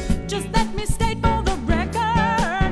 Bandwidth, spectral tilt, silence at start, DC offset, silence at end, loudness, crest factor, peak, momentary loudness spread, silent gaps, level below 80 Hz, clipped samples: 11 kHz; -5.5 dB/octave; 0 s; under 0.1%; 0 s; -22 LUFS; 16 dB; -4 dBFS; 5 LU; none; -26 dBFS; under 0.1%